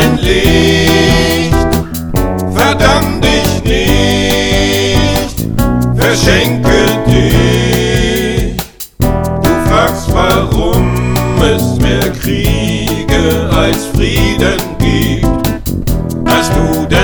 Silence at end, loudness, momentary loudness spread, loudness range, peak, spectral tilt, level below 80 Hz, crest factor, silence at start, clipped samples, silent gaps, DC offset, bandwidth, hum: 0 s; -11 LUFS; 6 LU; 2 LU; 0 dBFS; -5 dB/octave; -18 dBFS; 10 dB; 0 s; 0.7%; none; under 0.1%; over 20 kHz; none